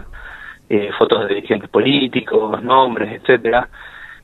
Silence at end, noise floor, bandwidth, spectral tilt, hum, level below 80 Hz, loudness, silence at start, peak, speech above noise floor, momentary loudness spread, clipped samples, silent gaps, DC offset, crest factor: 0.1 s; -35 dBFS; 4.2 kHz; -7 dB/octave; none; -46 dBFS; -16 LUFS; 0 s; 0 dBFS; 19 dB; 20 LU; under 0.1%; none; under 0.1%; 18 dB